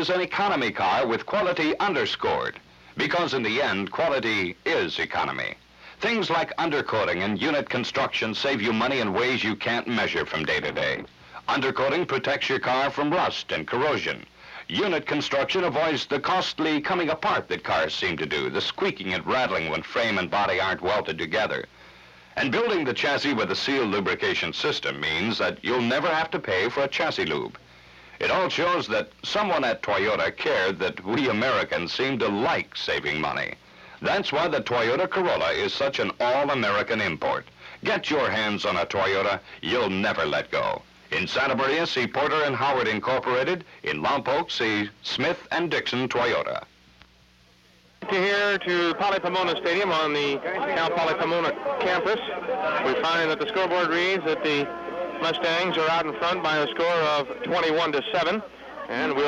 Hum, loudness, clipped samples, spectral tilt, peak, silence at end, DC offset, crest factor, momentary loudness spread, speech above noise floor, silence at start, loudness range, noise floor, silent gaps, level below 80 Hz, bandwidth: none; -25 LUFS; under 0.1%; -4.5 dB/octave; -14 dBFS; 0 s; under 0.1%; 12 dB; 5 LU; 32 dB; 0 s; 2 LU; -57 dBFS; none; -60 dBFS; 12 kHz